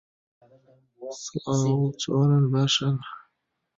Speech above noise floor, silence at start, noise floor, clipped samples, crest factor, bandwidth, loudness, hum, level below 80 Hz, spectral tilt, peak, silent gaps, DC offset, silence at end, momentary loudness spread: 52 dB; 1 s; -77 dBFS; under 0.1%; 16 dB; 7.8 kHz; -24 LUFS; none; -62 dBFS; -5.5 dB/octave; -10 dBFS; none; under 0.1%; 0.6 s; 20 LU